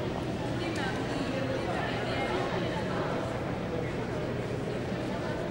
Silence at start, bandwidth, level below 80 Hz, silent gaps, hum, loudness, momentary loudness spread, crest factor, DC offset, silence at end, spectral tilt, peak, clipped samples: 0 s; 16 kHz; -50 dBFS; none; none; -32 LUFS; 3 LU; 14 dB; under 0.1%; 0 s; -6 dB/octave; -18 dBFS; under 0.1%